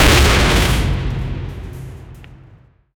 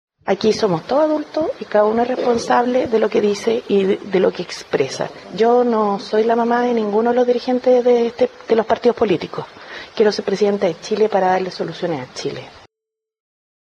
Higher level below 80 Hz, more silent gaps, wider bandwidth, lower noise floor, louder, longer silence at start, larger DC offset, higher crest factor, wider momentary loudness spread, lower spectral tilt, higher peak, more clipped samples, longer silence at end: first, -20 dBFS vs -58 dBFS; neither; first, over 20 kHz vs 10 kHz; second, -47 dBFS vs -84 dBFS; first, -15 LUFS vs -18 LUFS; second, 0 s vs 0.25 s; neither; about the same, 14 dB vs 14 dB; first, 22 LU vs 9 LU; second, -4 dB/octave vs -5.5 dB/octave; about the same, -2 dBFS vs -2 dBFS; neither; second, 0.65 s vs 1.1 s